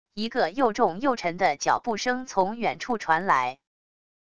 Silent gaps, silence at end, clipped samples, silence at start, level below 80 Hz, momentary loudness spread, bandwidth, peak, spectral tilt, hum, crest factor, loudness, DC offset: none; 0.65 s; under 0.1%; 0.05 s; -60 dBFS; 6 LU; 11 kHz; -8 dBFS; -4 dB/octave; none; 18 dB; -25 LUFS; 0.4%